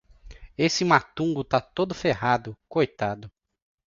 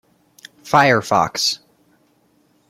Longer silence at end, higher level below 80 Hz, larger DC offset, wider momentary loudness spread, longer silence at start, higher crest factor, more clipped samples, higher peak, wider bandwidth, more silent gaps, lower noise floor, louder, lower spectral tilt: second, 0.6 s vs 1.15 s; first, -54 dBFS vs -60 dBFS; neither; first, 9 LU vs 6 LU; second, 0.25 s vs 0.65 s; about the same, 22 dB vs 20 dB; neither; second, -4 dBFS vs 0 dBFS; second, 7.6 kHz vs 16.5 kHz; neither; second, -46 dBFS vs -59 dBFS; second, -25 LUFS vs -16 LUFS; first, -5 dB/octave vs -3.5 dB/octave